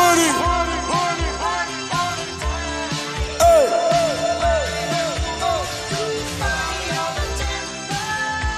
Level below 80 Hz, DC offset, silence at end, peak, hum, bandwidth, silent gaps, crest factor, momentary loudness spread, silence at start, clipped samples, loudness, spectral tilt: -32 dBFS; under 0.1%; 0 s; -4 dBFS; none; 15.5 kHz; none; 16 dB; 9 LU; 0 s; under 0.1%; -20 LUFS; -3.5 dB/octave